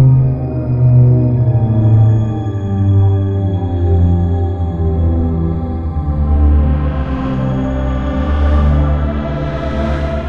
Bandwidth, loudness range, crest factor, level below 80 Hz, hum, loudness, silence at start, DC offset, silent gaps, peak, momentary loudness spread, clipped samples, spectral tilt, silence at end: 4.4 kHz; 4 LU; 12 dB; -18 dBFS; none; -14 LUFS; 0 s; under 0.1%; none; 0 dBFS; 8 LU; under 0.1%; -10.5 dB/octave; 0 s